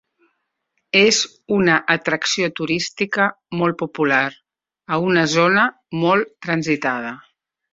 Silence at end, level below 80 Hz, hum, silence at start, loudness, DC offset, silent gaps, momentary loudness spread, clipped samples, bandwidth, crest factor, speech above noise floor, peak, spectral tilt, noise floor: 0.55 s; -60 dBFS; none; 0.95 s; -18 LUFS; under 0.1%; none; 8 LU; under 0.1%; 7.8 kHz; 18 dB; 55 dB; -2 dBFS; -4 dB/octave; -73 dBFS